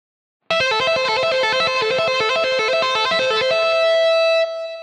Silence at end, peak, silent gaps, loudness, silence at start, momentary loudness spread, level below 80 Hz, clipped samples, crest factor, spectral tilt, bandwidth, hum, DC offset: 0 s; -8 dBFS; none; -17 LUFS; 0.5 s; 3 LU; -60 dBFS; under 0.1%; 10 dB; -1.5 dB/octave; 10.5 kHz; none; under 0.1%